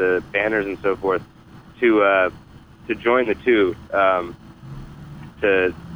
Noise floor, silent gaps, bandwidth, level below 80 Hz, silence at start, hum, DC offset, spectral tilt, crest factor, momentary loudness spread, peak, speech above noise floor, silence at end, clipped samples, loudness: -38 dBFS; none; 9.8 kHz; -48 dBFS; 0 s; none; under 0.1%; -7 dB/octave; 16 dB; 22 LU; -4 dBFS; 19 dB; 0 s; under 0.1%; -20 LUFS